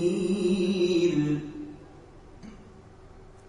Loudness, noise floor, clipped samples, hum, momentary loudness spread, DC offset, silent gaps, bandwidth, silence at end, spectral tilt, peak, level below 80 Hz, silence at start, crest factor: -26 LUFS; -49 dBFS; under 0.1%; none; 24 LU; under 0.1%; none; 10.5 kHz; 0 s; -6.5 dB/octave; -14 dBFS; -54 dBFS; 0 s; 14 dB